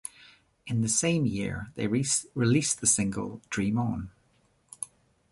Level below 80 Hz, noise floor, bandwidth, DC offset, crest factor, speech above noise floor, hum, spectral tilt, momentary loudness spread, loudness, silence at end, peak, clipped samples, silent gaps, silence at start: -54 dBFS; -67 dBFS; 11.5 kHz; under 0.1%; 20 dB; 39 dB; none; -4 dB/octave; 16 LU; -27 LUFS; 0.45 s; -10 dBFS; under 0.1%; none; 0.05 s